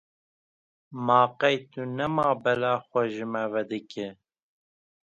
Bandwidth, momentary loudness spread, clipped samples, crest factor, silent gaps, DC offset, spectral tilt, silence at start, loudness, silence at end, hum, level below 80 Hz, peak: 8 kHz; 14 LU; under 0.1%; 22 dB; none; under 0.1%; -6.5 dB/octave; 0.9 s; -26 LUFS; 0.95 s; none; -68 dBFS; -6 dBFS